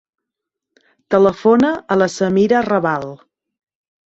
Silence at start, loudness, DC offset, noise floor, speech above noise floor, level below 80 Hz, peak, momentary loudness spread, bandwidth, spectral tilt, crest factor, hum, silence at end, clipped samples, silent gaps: 1.1 s; -15 LUFS; under 0.1%; -82 dBFS; 67 dB; -56 dBFS; -2 dBFS; 7 LU; 8 kHz; -6.5 dB/octave; 16 dB; none; 0.9 s; under 0.1%; none